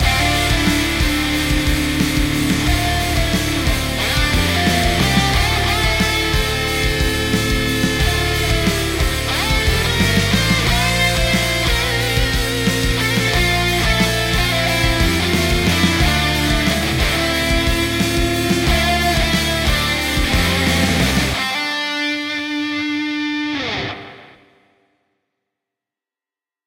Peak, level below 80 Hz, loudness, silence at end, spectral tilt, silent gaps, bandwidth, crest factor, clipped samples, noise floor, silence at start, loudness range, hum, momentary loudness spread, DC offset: -2 dBFS; -24 dBFS; -16 LUFS; 2.4 s; -4 dB/octave; none; 16 kHz; 14 dB; under 0.1%; under -90 dBFS; 0 s; 5 LU; none; 4 LU; under 0.1%